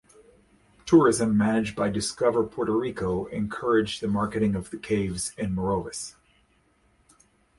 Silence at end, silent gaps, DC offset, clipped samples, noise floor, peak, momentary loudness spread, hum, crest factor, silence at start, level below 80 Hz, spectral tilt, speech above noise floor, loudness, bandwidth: 1.5 s; none; under 0.1%; under 0.1%; -65 dBFS; -6 dBFS; 10 LU; none; 20 dB; 0.85 s; -50 dBFS; -5.5 dB/octave; 40 dB; -25 LUFS; 11.5 kHz